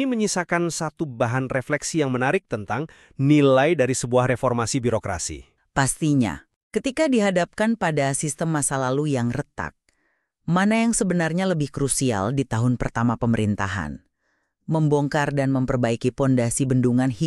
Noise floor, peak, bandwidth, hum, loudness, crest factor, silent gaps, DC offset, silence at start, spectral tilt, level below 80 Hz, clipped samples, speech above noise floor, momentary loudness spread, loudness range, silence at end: -72 dBFS; -6 dBFS; 13.5 kHz; none; -22 LUFS; 18 dB; 6.56-6.70 s; under 0.1%; 0 s; -5.5 dB/octave; -46 dBFS; under 0.1%; 50 dB; 9 LU; 3 LU; 0 s